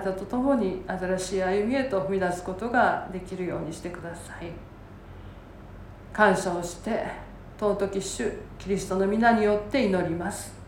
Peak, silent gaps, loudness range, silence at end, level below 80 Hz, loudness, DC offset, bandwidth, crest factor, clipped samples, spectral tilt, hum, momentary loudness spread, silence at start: -6 dBFS; none; 5 LU; 0 s; -48 dBFS; -27 LUFS; under 0.1%; 17 kHz; 22 dB; under 0.1%; -5.5 dB/octave; none; 23 LU; 0 s